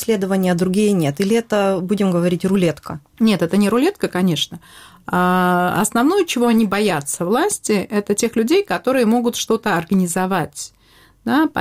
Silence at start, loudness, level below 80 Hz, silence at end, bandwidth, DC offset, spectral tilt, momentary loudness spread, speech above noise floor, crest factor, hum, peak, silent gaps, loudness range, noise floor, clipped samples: 0 s; -18 LUFS; -54 dBFS; 0 s; 16.5 kHz; under 0.1%; -5 dB/octave; 6 LU; 33 dB; 14 dB; none; -4 dBFS; none; 1 LU; -51 dBFS; under 0.1%